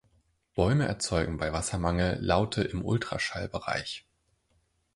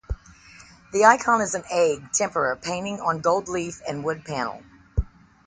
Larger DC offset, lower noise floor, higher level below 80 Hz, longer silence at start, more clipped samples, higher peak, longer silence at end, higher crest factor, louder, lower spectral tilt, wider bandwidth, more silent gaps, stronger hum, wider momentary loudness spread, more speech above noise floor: neither; first, -72 dBFS vs -49 dBFS; second, -44 dBFS vs -38 dBFS; first, 0.55 s vs 0.1 s; neither; second, -10 dBFS vs 0 dBFS; first, 0.95 s vs 0.45 s; about the same, 20 dB vs 24 dB; second, -30 LUFS vs -23 LUFS; about the same, -5 dB/octave vs -4 dB/octave; first, 11.5 kHz vs 9.6 kHz; neither; neither; second, 7 LU vs 14 LU; first, 43 dB vs 26 dB